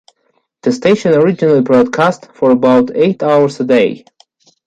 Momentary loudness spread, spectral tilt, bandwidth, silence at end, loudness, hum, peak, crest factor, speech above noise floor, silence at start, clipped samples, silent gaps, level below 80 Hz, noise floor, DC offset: 6 LU; -7 dB/octave; 9 kHz; 0.7 s; -12 LUFS; none; 0 dBFS; 12 dB; 51 dB; 0.65 s; under 0.1%; none; -56 dBFS; -62 dBFS; under 0.1%